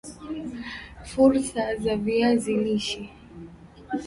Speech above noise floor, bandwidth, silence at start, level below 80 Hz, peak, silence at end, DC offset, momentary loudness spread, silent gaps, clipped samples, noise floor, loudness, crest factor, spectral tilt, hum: 22 dB; 11.5 kHz; 0.05 s; -50 dBFS; -8 dBFS; 0 s; under 0.1%; 23 LU; none; under 0.1%; -45 dBFS; -25 LUFS; 18 dB; -5 dB/octave; none